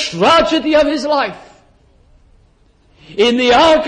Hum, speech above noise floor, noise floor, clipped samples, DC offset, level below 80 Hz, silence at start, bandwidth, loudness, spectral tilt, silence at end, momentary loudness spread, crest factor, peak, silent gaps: none; 40 dB; -52 dBFS; under 0.1%; under 0.1%; -42 dBFS; 0 s; 10 kHz; -12 LUFS; -4 dB/octave; 0 s; 8 LU; 12 dB; -2 dBFS; none